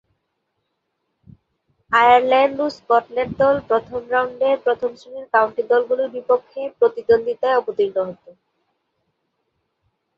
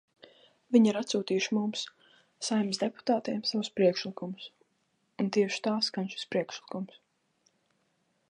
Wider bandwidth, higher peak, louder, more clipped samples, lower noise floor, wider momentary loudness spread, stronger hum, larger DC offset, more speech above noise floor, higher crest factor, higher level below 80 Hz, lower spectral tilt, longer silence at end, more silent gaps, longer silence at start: second, 7.4 kHz vs 10.5 kHz; first, -2 dBFS vs -10 dBFS; first, -19 LUFS vs -30 LUFS; neither; about the same, -74 dBFS vs -75 dBFS; second, 11 LU vs 14 LU; neither; neither; first, 56 dB vs 46 dB; about the same, 18 dB vs 20 dB; first, -58 dBFS vs -82 dBFS; about the same, -5.5 dB/octave vs -4.5 dB/octave; first, 2.05 s vs 1.45 s; neither; first, 1.9 s vs 0.7 s